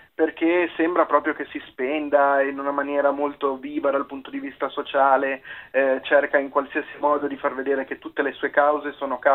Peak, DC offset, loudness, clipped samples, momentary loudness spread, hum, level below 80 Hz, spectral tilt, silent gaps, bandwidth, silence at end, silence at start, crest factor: -4 dBFS; under 0.1%; -23 LUFS; under 0.1%; 10 LU; none; -64 dBFS; -7 dB/octave; none; 4.1 kHz; 0 s; 0.2 s; 18 dB